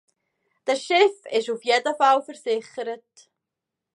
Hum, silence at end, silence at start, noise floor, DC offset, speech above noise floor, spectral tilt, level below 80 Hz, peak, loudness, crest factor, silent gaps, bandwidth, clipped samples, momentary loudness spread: none; 1 s; 0.65 s; -85 dBFS; under 0.1%; 63 dB; -2 dB/octave; -86 dBFS; -4 dBFS; -23 LUFS; 20 dB; none; 11 kHz; under 0.1%; 13 LU